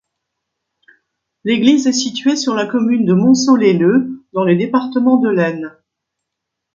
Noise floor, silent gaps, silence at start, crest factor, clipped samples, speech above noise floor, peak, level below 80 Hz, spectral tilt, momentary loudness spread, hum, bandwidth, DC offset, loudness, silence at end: -78 dBFS; none; 1.45 s; 14 dB; under 0.1%; 65 dB; 0 dBFS; -62 dBFS; -5.5 dB/octave; 8 LU; none; 7.6 kHz; under 0.1%; -14 LUFS; 1.05 s